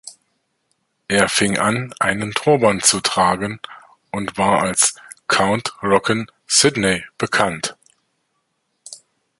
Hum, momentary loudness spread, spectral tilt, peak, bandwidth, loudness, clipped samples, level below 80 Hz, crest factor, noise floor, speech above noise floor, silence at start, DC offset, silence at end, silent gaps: none; 13 LU; -3 dB/octave; 0 dBFS; 16 kHz; -17 LUFS; under 0.1%; -52 dBFS; 20 dB; -70 dBFS; 52 dB; 0.05 s; under 0.1%; 0.45 s; none